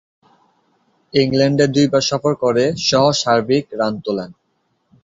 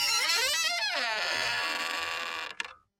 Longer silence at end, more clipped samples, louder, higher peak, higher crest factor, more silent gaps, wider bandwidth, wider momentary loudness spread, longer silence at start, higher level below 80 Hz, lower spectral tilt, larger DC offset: first, 0.7 s vs 0.25 s; neither; first, -16 LUFS vs -28 LUFS; first, -2 dBFS vs -12 dBFS; about the same, 16 dB vs 18 dB; neither; second, 8 kHz vs 17 kHz; second, 8 LU vs 11 LU; first, 1.15 s vs 0 s; first, -54 dBFS vs -68 dBFS; first, -5 dB/octave vs 1.5 dB/octave; neither